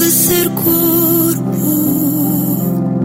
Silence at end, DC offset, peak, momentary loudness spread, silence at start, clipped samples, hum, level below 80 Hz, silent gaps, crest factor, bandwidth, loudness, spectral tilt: 0 s; under 0.1%; -2 dBFS; 5 LU; 0 s; under 0.1%; none; -46 dBFS; none; 12 dB; 16.5 kHz; -12 LUFS; -5 dB/octave